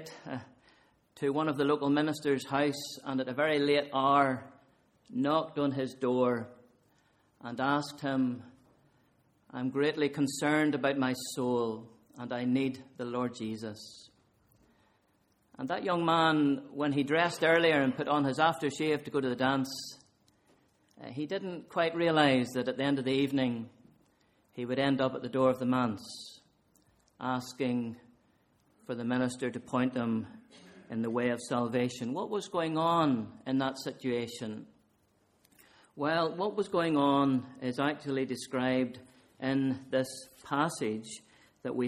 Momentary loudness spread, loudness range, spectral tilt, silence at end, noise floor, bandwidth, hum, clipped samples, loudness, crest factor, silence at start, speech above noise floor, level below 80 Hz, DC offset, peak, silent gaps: 15 LU; 7 LU; -5.5 dB/octave; 0 s; -71 dBFS; 15 kHz; none; under 0.1%; -31 LUFS; 22 dB; 0 s; 41 dB; -72 dBFS; under 0.1%; -10 dBFS; none